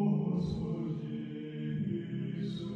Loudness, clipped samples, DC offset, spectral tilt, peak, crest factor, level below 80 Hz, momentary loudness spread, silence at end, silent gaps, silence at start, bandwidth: -36 LUFS; under 0.1%; under 0.1%; -9 dB/octave; -20 dBFS; 14 dB; -58 dBFS; 8 LU; 0 s; none; 0 s; 7.2 kHz